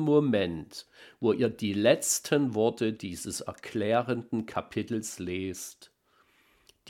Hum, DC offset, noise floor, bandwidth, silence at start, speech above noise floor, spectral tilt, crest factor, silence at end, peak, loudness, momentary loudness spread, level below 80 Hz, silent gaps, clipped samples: none; under 0.1%; -66 dBFS; 18 kHz; 0 s; 38 dB; -4.5 dB/octave; 22 dB; 0 s; -8 dBFS; -29 LUFS; 12 LU; -64 dBFS; none; under 0.1%